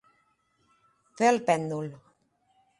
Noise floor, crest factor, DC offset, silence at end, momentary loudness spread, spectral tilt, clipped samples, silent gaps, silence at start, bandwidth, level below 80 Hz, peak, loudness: -70 dBFS; 22 dB; under 0.1%; 0.85 s; 13 LU; -5 dB/octave; under 0.1%; none; 1.2 s; 11.5 kHz; -76 dBFS; -8 dBFS; -26 LUFS